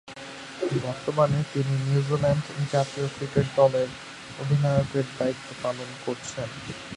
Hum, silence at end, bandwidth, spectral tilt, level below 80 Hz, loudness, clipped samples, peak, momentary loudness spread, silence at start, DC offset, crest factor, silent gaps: none; 0 s; 11 kHz; -6.5 dB/octave; -54 dBFS; -26 LUFS; under 0.1%; -6 dBFS; 12 LU; 0.05 s; under 0.1%; 20 dB; none